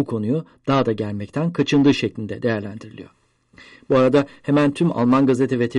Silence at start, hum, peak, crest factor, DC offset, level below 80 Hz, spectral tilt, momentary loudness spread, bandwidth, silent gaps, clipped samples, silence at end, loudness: 0 s; none; -4 dBFS; 16 dB; under 0.1%; -56 dBFS; -7 dB/octave; 10 LU; 11 kHz; none; under 0.1%; 0 s; -20 LUFS